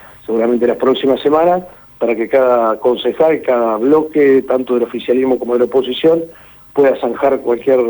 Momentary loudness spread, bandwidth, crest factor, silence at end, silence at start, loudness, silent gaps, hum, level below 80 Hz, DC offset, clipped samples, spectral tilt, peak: 6 LU; over 20 kHz; 12 dB; 0 s; 0.05 s; -14 LUFS; none; none; -52 dBFS; under 0.1%; under 0.1%; -7 dB/octave; -2 dBFS